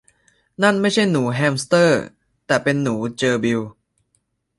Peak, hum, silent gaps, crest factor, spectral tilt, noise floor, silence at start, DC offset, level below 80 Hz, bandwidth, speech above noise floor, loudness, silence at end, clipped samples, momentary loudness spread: -2 dBFS; none; none; 18 dB; -5 dB/octave; -69 dBFS; 0.6 s; under 0.1%; -58 dBFS; 11.5 kHz; 51 dB; -19 LUFS; 0.9 s; under 0.1%; 7 LU